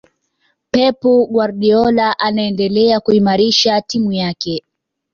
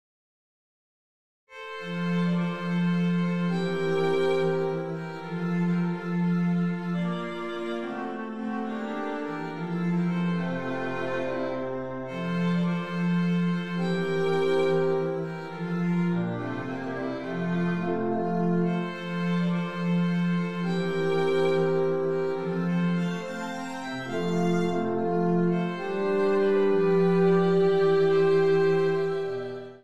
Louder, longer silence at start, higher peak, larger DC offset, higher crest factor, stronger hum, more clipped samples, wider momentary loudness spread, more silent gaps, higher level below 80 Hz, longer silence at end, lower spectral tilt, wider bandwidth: first, -14 LUFS vs -27 LUFS; second, 0.75 s vs 1.45 s; first, 0 dBFS vs -12 dBFS; second, under 0.1% vs 0.4%; about the same, 14 dB vs 14 dB; neither; neither; second, 7 LU vs 10 LU; neither; first, -52 dBFS vs -64 dBFS; first, 0.55 s vs 0 s; second, -5 dB/octave vs -8 dB/octave; second, 7.2 kHz vs 8.4 kHz